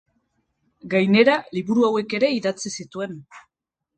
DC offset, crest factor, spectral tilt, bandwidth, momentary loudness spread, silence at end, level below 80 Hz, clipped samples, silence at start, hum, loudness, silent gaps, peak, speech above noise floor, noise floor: under 0.1%; 20 dB; -5 dB/octave; 9.2 kHz; 16 LU; 0.6 s; -66 dBFS; under 0.1%; 0.85 s; none; -21 LUFS; none; -4 dBFS; 50 dB; -70 dBFS